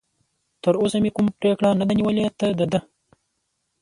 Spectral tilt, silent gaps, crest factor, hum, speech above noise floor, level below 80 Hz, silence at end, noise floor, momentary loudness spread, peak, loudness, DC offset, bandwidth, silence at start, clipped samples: -7 dB/octave; none; 18 dB; none; 54 dB; -56 dBFS; 1 s; -74 dBFS; 4 LU; -6 dBFS; -21 LUFS; under 0.1%; 11 kHz; 0.65 s; under 0.1%